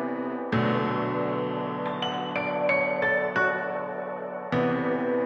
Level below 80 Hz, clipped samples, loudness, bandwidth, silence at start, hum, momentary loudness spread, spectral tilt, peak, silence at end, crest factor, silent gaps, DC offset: -64 dBFS; under 0.1%; -27 LUFS; 6.8 kHz; 0 s; none; 8 LU; -7 dB/octave; -12 dBFS; 0 s; 14 dB; none; under 0.1%